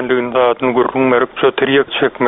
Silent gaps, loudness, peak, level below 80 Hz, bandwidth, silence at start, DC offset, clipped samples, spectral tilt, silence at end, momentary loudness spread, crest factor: none; -14 LUFS; 0 dBFS; -52 dBFS; 4 kHz; 0 s; under 0.1%; under 0.1%; -3 dB/octave; 0 s; 2 LU; 14 dB